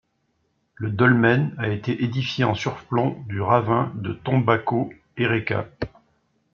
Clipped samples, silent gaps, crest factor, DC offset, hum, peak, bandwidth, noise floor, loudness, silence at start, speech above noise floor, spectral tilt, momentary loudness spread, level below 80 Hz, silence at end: under 0.1%; none; 20 dB; under 0.1%; none; -4 dBFS; 7 kHz; -70 dBFS; -22 LUFS; 0.8 s; 48 dB; -7.5 dB/octave; 11 LU; -56 dBFS; 0.65 s